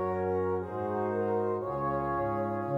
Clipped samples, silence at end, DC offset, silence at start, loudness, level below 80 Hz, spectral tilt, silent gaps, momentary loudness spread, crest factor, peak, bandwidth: under 0.1%; 0 s; under 0.1%; 0 s; -31 LUFS; -56 dBFS; -10 dB/octave; none; 2 LU; 12 dB; -18 dBFS; 5.2 kHz